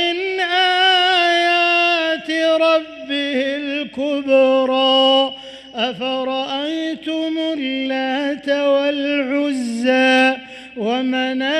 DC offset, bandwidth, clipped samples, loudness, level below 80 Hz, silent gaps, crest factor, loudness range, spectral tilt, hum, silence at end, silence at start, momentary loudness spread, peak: under 0.1%; 11.5 kHz; under 0.1%; -17 LUFS; -62 dBFS; none; 12 dB; 5 LU; -3 dB/octave; none; 0 s; 0 s; 10 LU; -4 dBFS